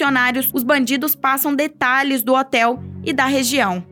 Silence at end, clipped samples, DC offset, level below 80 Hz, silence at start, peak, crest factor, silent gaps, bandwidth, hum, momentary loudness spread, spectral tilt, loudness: 0.1 s; under 0.1%; under 0.1%; -60 dBFS; 0 s; -4 dBFS; 14 dB; none; over 20 kHz; none; 3 LU; -3 dB/octave; -17 LUFS